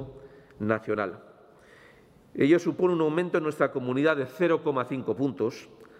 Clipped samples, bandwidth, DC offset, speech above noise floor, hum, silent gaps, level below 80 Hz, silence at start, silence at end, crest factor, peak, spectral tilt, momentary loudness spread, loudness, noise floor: under 0.1%; 11.5 kHz; under 0.1%; 29 dB; none; none; -66 dBFS; 0 s; 0.15 s; 18 dB; -10 dBFS; -7 dB/octave; 12 LU; -27 LUFS; -56 dBFS